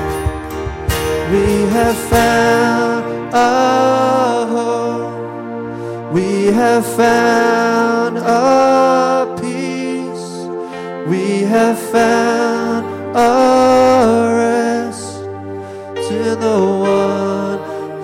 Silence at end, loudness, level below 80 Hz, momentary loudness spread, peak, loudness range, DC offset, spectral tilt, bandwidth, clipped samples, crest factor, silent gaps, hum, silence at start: 0 s; -14 LUFS; -36 dBFS; 14 LU; 0 dBFS; 4 LU; under 0.1%; -5 dB/octave; 16.5 kHz; under 0.1%; 14 dB; none; none; 0 s